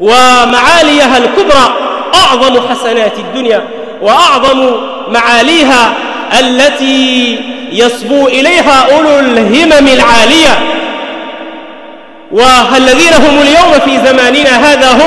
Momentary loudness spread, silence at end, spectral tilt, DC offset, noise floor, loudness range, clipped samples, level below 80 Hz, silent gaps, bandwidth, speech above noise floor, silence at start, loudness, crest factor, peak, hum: 11 LU; 0 s; -2.5 dB/octave; under 0.1%; -30 dBFS; 3 LU; 2%; -34 dBFS; none; 12 kHz; 24 dB; 0 s; -5 LUFS; 6 dB; 0 dBFS; none